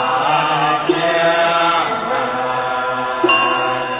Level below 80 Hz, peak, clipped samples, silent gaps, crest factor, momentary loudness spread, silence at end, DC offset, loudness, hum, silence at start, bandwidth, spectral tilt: -54 dBFS; -4 dBFS; under 0.1%; none; 14 dB; 6 LU; 0 s; under 0.1%; -16 LUFS; none; 0 s; 4 kHz; -8 dB/octave